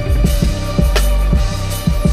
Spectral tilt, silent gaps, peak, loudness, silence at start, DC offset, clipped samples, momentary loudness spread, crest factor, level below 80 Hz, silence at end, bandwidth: -5.5 dB/octave; none; 0 dBFS; -16 LUFS; 0 s; under 0.1%; under 0.1%; 3 LU; 12 dB; -16 dBFS; 0 s; 15.5 kHz